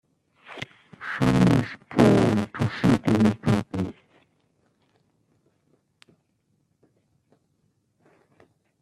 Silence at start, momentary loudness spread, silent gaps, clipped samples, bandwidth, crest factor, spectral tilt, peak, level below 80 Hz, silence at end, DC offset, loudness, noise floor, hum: 0.5 s; 20 LU; none; under 0.1%; 13.5 kHz; 22 dB; -7.5 dB/octave; -4 dBFS; -50 dBFS; 4.9 s; under 0.1%; -22 LUFS; -70 dBFS; none